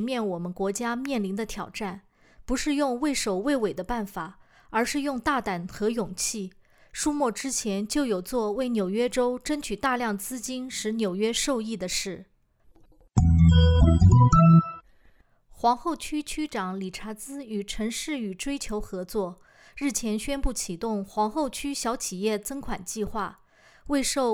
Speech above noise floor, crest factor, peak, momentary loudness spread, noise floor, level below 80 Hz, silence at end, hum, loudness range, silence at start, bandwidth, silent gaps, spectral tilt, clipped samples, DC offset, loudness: 33 dB; 18 dB; -8 dBFS; 15 LU; -59 dBFS; -38 dBFS; 0 s; none; 10 LU; 0 s; 16.5 kHz; none; -5.5 dB/octave; under 0.1%; under 0.1%; -26 LUFS